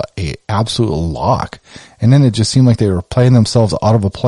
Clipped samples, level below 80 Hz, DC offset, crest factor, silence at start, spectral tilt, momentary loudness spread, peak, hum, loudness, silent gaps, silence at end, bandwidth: under 0.1%; -34 dBFS; under 0.1%; 12 dB; 0 s; -6.5 dB/octave; 8 LU; -2 dBFS; none; -13 LUFS; none; 0 s; 11.5 kHz